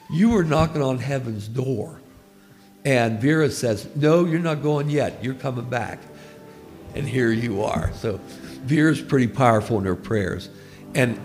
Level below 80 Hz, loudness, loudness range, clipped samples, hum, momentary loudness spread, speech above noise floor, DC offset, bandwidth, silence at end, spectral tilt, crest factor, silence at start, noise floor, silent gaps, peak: -44 dBFS; -22 LUFS; 4 LU; under 0.1%; none; 16 LU; 29 dB; under 0.1%; 15.5 kHz; 0 s; -6.5 dB/octave; 20 dB; 0.1 s; -50 dBFS; none; -2 dBFS